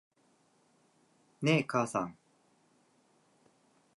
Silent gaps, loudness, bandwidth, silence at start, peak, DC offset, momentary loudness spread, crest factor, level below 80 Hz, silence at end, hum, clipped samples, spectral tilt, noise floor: none; -32 LUFS; 11.5 kHz; 1.4 s; -14 dBFS; under 0.1%; 8 LU; 24 dB; -78 dBFS; 1.85 s; none; under 0.1%; -5.5 dB/octave; -70 dBFS